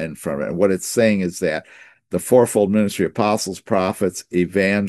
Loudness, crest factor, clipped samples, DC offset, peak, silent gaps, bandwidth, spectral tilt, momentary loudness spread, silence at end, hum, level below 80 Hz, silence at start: -19 LUFS; 18 dB; under 0.1%; under 0.1%; -2 dBFS; none; 12.5 kHz; -5.5 dB/octave; 9 LU; 0 s; none; -58 dBFS; 0 s